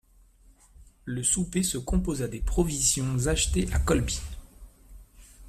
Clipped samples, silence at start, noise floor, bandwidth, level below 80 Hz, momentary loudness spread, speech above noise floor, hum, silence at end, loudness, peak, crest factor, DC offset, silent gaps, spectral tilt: under 0.1%; 0.8 s; -57 dBFS; 15 kHz; -34 dBFS; 11 LU; 31 dB; none; 0 s; -27 LUFS; -10 dBFS; 18 dB; under 0.1%; none; -4 dB/octave